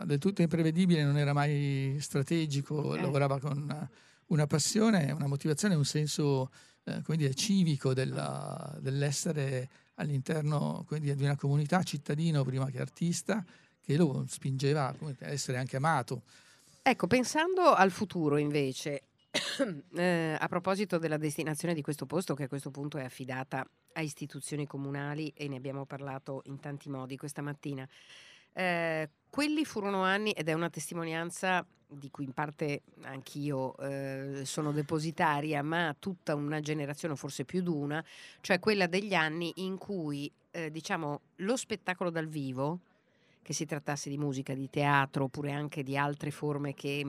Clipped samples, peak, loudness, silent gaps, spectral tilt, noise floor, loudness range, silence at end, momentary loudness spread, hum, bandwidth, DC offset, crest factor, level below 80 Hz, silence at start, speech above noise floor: under 0.1%; -8 dBFS; -33 LUFS; none; -5.5 dB/octave; -68 dBFS; 8 LU; 0 s; 12 LU; none; 14.5 kHz; under 0.1%; 24 dB; -72 dBFS; 0 s; 36 dB